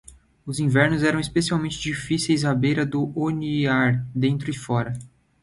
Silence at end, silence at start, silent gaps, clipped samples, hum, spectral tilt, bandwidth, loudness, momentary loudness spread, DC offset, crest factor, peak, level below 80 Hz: 0.35 s; 0.1 s; none; under 0.1%; none; -5.5 dB/octave; 11.5 kHz; -23 LUFS; 8 LU; under 0.1%; 18 dB; -6 dBFS; -50 dBFS